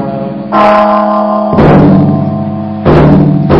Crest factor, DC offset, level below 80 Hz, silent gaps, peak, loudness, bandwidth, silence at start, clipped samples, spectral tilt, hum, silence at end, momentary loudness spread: 6 dB; 0.3%; -26 dBFS; none; 0 dBFS; -7 LUFS; 5.8 kHz; 0 s; 2%; -10 dB/octave; none; 0 s; 10 LU